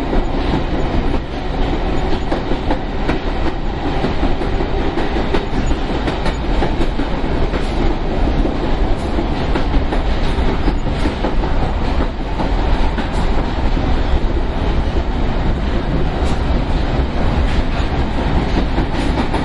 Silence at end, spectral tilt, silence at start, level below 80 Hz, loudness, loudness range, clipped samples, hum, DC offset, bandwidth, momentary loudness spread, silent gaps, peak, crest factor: 0 s; -7 dB/octave; 0 s; -18 dBFS; -19 LUFS; 1 LU; under 0.1%; none; under 0.1%; 10 kHz; 2 LU; none; -2 dBFS; 14 dB